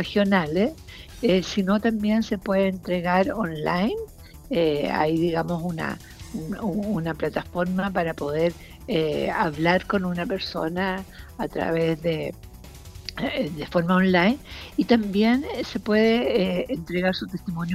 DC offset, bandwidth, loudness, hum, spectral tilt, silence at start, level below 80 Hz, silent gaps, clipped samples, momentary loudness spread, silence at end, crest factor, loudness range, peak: under 0.1%; 16 kHz; -24 LUFS; none; -6.5 dB/octave; 0 s; -46 dBFS; none; under 0.1%; 12 LU; 0 s; 20 dB; 5 LU; -4 dBFS